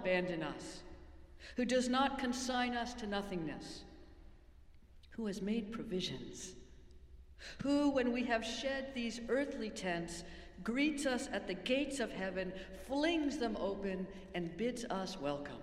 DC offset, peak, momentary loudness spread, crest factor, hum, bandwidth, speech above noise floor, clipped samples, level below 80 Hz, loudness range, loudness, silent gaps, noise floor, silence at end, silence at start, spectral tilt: under 0.1%; -20 dBFS; 15 LU; 20 dB; none; 13.5 kHz; 21 dB; under 0.1%; -58 dBFS; 6 LU; -38 LUFS; none; -59 dBFS; 0 s; 0 s; -4.5 dB/octave